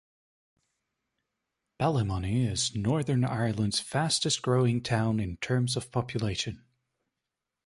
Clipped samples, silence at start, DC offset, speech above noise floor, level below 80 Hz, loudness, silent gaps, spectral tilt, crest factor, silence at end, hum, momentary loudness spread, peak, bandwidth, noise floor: under 0.1%; 1.8 s; under 0.1%; 59 dB; -52 dBFS; -29 LUFS; none; -5 dB/octave; 16 dB; 1.1 s; none; 5 LU; -14 dBFS; 11.5 kHz; -87 dBFS